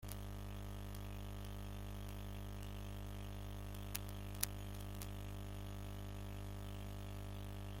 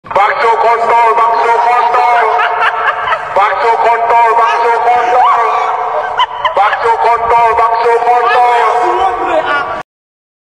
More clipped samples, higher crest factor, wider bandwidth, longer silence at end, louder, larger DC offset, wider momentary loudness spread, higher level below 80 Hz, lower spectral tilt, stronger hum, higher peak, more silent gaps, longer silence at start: neither; first, 38 dB vs 10 dB; first, 16.5 kHz vs 11 kHz; second, 0 s vs 0.65 s; second, -49 LUFS vs -10 LUFS; second, under 0.1% vs 0.2%; about the same, 4 LU vs 5 LU; about the same, -52 dBFS vs -48 dBFS; first, -4.5 dB/octave vs -3 dB/octave; first, 50 Hz at -50 dBFS vs none; second, -8 dBFS vs 0 dBFS; neither; about the same, 0 s vs 0.05 s